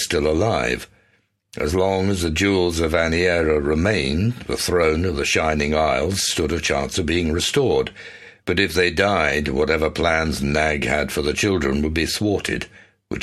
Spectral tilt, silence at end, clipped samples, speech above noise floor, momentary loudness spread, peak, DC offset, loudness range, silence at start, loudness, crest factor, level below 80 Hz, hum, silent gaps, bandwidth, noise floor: -4.5 dB/octave; 0 s; under 0.1%; 43 dB; 6 LU; -4 dBFS; under 0.1%; 1 LU; 0 s; -20 LUFS; 16 dB; -36 dBFS; none; none; 14.5 kHz; -63 dBFS